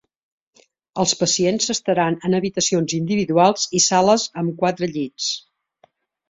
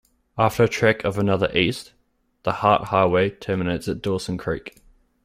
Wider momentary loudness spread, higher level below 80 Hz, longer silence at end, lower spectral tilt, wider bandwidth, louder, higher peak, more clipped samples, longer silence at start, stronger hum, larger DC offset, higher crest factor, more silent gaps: second, 8 LU vs 11 LU; second, -60 dBFS vs -50 dBFS; first, 0.9 s vs 0.55 s; second, -3.5 dB/octave vs -6 dB/octave; second, 8.2 kHz vs 16 kHz; first, -19 LUFS vs -22 LUFS; about the same, -2 dBFS vs -2 dBFS; neither; first, 0.95 s vs 0.35 s; neither; neither; about the same, 18 dB vs 20 dB; neither